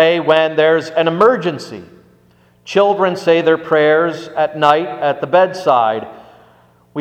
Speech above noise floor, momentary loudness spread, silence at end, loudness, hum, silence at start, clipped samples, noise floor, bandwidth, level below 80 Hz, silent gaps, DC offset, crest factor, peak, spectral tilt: 37 dB; 11 LU; 0 s; -14 LUFS; none; 0 s; under 0.1%; -51 dBFS; 9 kHz; -62 dBFS; none; under 0.1%; 14 dB; 0 dBFS; -5.5 dB/octave